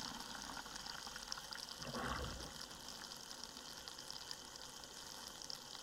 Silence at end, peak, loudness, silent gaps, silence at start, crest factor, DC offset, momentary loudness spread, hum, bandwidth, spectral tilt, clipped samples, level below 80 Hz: 0 s; -24 dBFS; -48 LUFS; none; 0 s; 26 dB; under 0.1%; 5 LU; none; 16.5 kHz; -2 dB/octave; under 0.1%; -62 dBFS